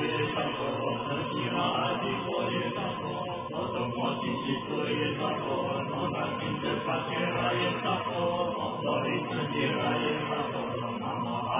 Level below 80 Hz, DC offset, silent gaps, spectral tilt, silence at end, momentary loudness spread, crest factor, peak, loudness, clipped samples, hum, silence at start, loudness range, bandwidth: -60 dBFS; under 0.1%; none; -3.5 dB/octave; 0 s; 5 LU; 14 dB; -16 dBFS; -30 LUFS; under 0.1%; none; 0 s; 2 LU; 3.8 kHz